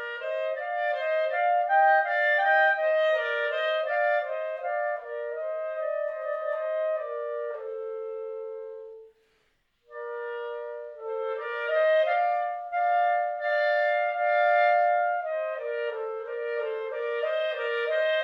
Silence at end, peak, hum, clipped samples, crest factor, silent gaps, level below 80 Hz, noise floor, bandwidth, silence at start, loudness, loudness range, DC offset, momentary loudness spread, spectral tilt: 0 s; -12 dBFS; none; under 0.1%; 14 dB; none; -78 dBFS; -70 dBFS; 5.6 kHz; 0 s; -27 LUFS; 13 LU; under 0.1%; 14 LU; -0.5 dB/octave